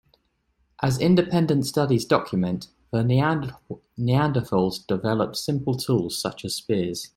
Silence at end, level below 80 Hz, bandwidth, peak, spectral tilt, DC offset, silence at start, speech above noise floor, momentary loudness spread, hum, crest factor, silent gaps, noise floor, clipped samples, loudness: 0.1 s; -54 dBFS; 16 kHz; -4 dBFS; -6 dB/octave; under 0.1%; 0.8 s; 46 dB; 9 LU; none; 20 dB; none; -69 dBFS; under 0.1%; -24 LUFS